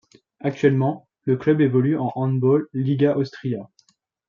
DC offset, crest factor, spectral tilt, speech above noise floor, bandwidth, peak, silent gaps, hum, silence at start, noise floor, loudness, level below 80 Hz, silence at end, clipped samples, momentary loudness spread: under 0.1%; 16 dB; -9.5 dB/octave; 42 dB; 7 kHz; -4 dBFS; none; none; 0.45 s; -63 dBFS; -21 LUFS; -66 dBFS; 0.65 s; under 0.1%; 10 LU